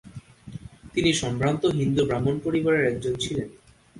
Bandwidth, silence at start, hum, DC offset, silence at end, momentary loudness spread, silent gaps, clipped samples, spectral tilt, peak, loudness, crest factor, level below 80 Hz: 11.5 kHz; 0.05 s; none; under 0.1%; 0 s; 19 LU; none; under 0.1%; -5.5 dB/octave; -8 dBFS; -24 LUFS; 16 dB; -50 dBFS